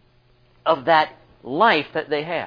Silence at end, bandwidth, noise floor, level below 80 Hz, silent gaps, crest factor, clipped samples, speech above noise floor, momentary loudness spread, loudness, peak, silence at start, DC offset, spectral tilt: 0 s; 5.2 kHz; -57 dBFS; -60 dBFS; none; 20 dB; under 0.1%; 37 dB; 10 LU; -20 LUFS; -2 dBFS; 0.65 s; under 0.1%; -6.5 dB/octave